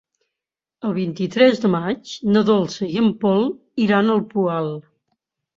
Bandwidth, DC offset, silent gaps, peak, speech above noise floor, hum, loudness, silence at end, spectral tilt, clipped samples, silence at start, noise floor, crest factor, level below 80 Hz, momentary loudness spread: 7.4 kHz; under 0.1%; none; -2 dBFS; 68 dB; none; -19 LUFS; 0.8 s; -6.5 dB/octave; under 0.1%; 0.85 s; -87 dBFS; 18 dB; -62 dBFS; 10 LU